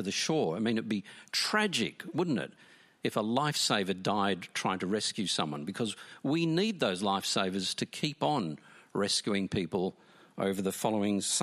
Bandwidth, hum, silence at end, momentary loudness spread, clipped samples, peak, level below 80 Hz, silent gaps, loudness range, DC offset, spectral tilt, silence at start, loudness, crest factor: 15 kHz; none; 0 s; 8 LU; under 0.1%; -12 dBFS; -72 dBFS; none; 1 LU; under 0.1%; -4 dB/octave; 0 s; -31 LUFS; 20 dB